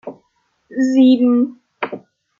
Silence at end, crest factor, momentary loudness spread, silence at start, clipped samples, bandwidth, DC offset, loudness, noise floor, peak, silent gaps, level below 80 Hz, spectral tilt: 0.4 s; 14 dB; 20 LU; 0.05 s; under 0.1%; 7.2 kHz; under 0.1%; -15 LUFS; -64 dBFS; -2 dBFS; none; -68 dBFS; -5.5 dB/octave